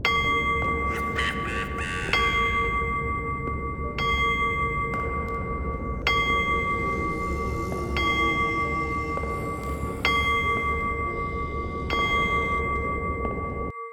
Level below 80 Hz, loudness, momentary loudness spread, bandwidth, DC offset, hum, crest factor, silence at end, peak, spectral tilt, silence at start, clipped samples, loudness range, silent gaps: -36 dBFS; -25 LUFS; 8 LU; 17.5 kHz; under 0.1%; none; 18 dB; 0 s; -6 dBFS; -5 dB/octave; 0 s; under 0.1%; 2 LU; none